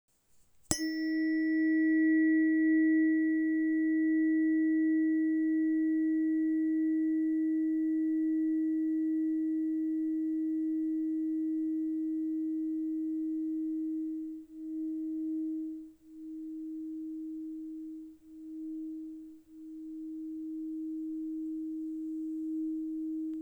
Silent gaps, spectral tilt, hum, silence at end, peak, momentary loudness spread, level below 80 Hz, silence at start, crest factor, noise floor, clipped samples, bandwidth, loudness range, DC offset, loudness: none; -4.5 dB/octave; none; 0 s; -6 dBFS; 16 LU; -70 dBFS; 0.7 s; 26 dB; -64 dBFS; under 0.1%; over 20 kHz; 14 LU; under 0.1%; -32 LUFS